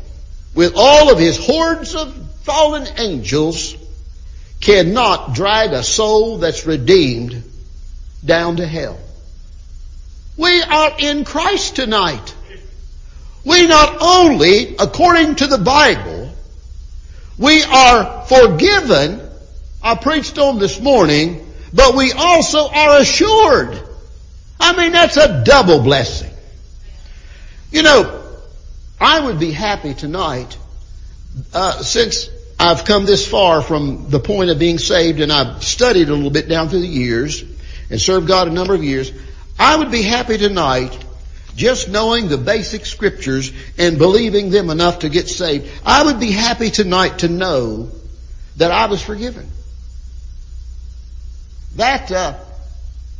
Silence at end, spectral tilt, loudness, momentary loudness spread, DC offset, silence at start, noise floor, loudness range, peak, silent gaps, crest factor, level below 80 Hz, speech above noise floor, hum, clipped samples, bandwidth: 0 s; -4 dB/octave; -12 LUFS; 17 LU; under 0.1%; 0 s; -35 dBFS; 7 LU; 0 dBFS; none; 14 dB; -30 dBFS; 22 dB; none; under 0.1%; 7.8 kHz